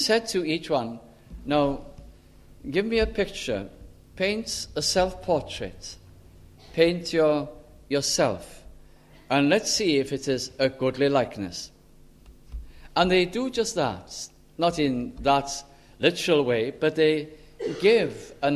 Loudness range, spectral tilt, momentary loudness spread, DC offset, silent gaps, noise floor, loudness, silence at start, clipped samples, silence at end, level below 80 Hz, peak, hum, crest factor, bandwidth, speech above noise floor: 4 LU; -4 dB/octave; 16 LU; under 0.1%; none; -52 dBFS; -25 LUFS; 0 s; under 0.1%; 0 s; -48 dBFS; -4 dBFS; none; 22 dB; 14 kHz; 27 dB